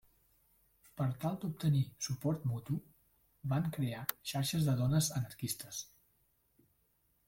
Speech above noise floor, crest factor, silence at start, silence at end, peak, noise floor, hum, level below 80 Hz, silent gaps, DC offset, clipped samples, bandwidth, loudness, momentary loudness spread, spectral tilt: 40 dB; 24 dB; 0.95 s; 1.45 s; -14 dBFS; -76 dBFS; none; -66 dBFS; none; under 0.1%; under 0.1%; 16.5 kHz; -36 LUFS; 10 LU; -5.5 dB/octave